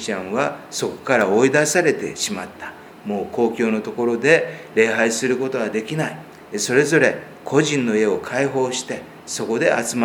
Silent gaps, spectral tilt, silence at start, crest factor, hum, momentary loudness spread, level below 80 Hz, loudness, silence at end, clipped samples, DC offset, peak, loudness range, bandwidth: none; -4 dB/octave; 0 s; 20 dB; none; 14 LU; -62 dBFS; -20 LUFS; 0 s; under 0.1%; under 0.1%; 0 dBFS; 1 LU; 19.5 kHz